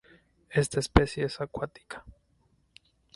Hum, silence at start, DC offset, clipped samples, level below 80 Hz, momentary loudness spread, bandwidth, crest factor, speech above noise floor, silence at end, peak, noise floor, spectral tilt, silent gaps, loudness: none; 0.5 s; under 0.1%; under 0.1%; -40 dBFS; 20 LU; 11.5 kHz; 32 dB; 40 dB; 1.05 s; 0 dBFS; -68 dBFS; -5.5 dB/octave; none; -29 LUFS